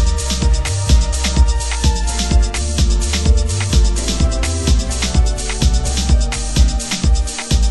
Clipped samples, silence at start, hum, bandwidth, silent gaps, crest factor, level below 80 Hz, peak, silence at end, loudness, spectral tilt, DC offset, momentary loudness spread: under 0.1%; 0 s; none; 12 kHz; none; 14 dB; -16 dBFS; 0 dBFS; 0 s; -17 LUFS; -4 dB/octave; under 0.1%; 3 LU